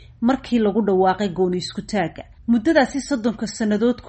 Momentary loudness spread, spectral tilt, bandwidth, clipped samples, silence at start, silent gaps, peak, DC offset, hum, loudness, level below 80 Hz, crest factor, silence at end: 7 LU; -5.5 dB/octave; 8.8 kHz; under 0.1%; 0 s; none; -4 dBFS; under 0.1%; none; -21 LUFS; -48 dBFS; 16 dB; 0 s